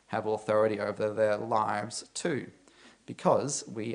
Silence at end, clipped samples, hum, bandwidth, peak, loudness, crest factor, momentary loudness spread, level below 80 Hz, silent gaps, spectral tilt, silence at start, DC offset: 0 s; under 0.1%; none; 10.5 kHz; -10 dBFS; -30 LUFS; 20 dB; 9 LU; -74 dBFS; none; -4.5 dB/octave; 0.1 s; under 0.1%